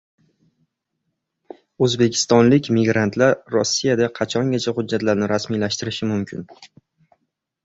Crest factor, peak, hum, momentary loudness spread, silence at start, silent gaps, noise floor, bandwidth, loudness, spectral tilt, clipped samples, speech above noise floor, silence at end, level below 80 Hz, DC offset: 18 dB; -2 dBFS; none; 8 LU; 1.8 s; none; -76 dBFS; 8 kHz; -19 LUFS; -5 dB/octave; under 0.1%; 57 dB; 1 s; -56 dBFS; under 0.1%